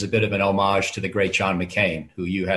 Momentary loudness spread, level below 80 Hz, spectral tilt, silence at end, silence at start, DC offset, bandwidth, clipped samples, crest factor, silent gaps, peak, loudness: 6 LU; -46 dBFS; -5 dB/octave; 0 s; 0 s; under 0.1%; 12 kHz; under 0.1%; 16 dB; none; -6 dBFS; -22 LUFS